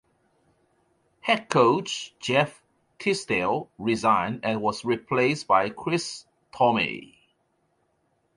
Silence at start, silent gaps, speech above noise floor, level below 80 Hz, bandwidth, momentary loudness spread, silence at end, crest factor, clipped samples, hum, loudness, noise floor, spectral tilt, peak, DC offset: 1.25 s; none; 46 dB; -64 dBFS; 11.5 kHz; 9 LU; 1.3 s; 22 dB; under 0.1%; none; -25 LUFS; -71 dBFS; -4.5 dB/octave; -6 dBFS; under 0.1%